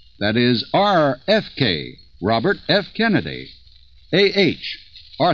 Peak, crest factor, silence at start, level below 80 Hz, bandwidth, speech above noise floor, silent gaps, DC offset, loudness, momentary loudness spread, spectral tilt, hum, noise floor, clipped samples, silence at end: -2 dBFS; 18 dB; 0.2 s; -50 dBFS; 7.2 kHz; 31 dB; none; 0.3%; -19 LUFS; 14 LU; -6.5 dB/octave; none; -49 dBFS; under 0.1%; 0 s